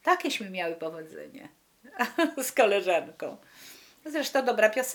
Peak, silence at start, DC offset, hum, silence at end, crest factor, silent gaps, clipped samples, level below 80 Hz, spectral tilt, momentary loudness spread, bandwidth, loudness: -6 dBFS; 0.05 s; under 0.1%; none; 0 s; 22 dB; none; under 0.1%; -80 dBFS; -2.5 dB/octave; 23 LU; over 20 kHz; -27 LUFS